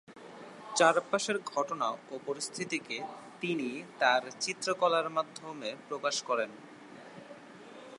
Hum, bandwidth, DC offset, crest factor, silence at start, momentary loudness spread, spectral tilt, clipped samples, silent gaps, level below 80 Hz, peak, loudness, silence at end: none; 11.5 kHz; under 0.1%; 24 dB; 0.1 s; 22 LU; -2.5 dB/octave; under 0.1%; none; -86 dBFS; -10 dBFS; -32 LUFS; 0 s